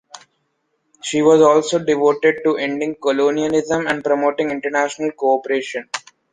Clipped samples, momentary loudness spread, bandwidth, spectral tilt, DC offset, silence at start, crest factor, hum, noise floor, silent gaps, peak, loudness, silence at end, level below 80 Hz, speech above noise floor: under 0.1%; 10 LU; 9.6 kHz; -4.5 dB/octave; under 0.1%; 0.15 s; 16 dB; none; -69 dBFS; none; -2 dBFS; -17 LUFS; 0.35 s; -60 dBFS; 52 dB